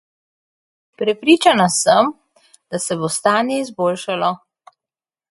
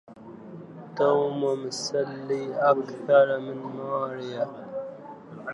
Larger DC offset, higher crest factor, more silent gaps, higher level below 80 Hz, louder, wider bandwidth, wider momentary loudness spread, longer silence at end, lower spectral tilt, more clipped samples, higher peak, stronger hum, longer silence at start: neither; about the same, 18 dB vs 20 dB; neither; first, -64 dBFS vs -78 dBFS; first, -17 LUFS vs -26 LUFS; about the same, 12 kHz vs 11 kHz; second, 10 LU vs 22 LU; first, 0.95 s vs 0 s; second, -3.5 dB/octave vs -5 dB/octave; neither; first, 0 dBFS vs -6 dBFS; neither; first, 1 s vs 0.1 s